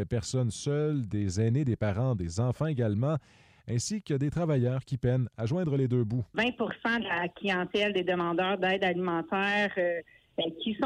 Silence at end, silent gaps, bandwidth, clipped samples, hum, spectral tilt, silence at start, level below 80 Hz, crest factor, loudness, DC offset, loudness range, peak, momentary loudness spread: 0 s; none; 11 kHz; under 0.1%; none; -6 dB/octave; 0 s; -56 dBFS; 12 dB; -30 LUFS; under 0.1%; 2 LU; -16 dBFS; 4 LU